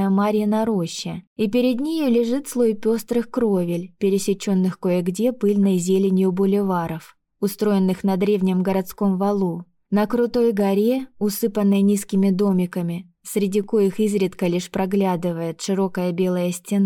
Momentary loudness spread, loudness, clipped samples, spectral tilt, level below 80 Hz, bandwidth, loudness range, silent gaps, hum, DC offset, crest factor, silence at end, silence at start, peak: 7 LU; -21 LUFS; under 0.1%; -6.5 dB/octave; -58 dBFS; 17.5 kHz; 2 LU; 1.27-1.36 s; none; under 0.1%; 10 dB; 0 s; 0 s; -10 dBFS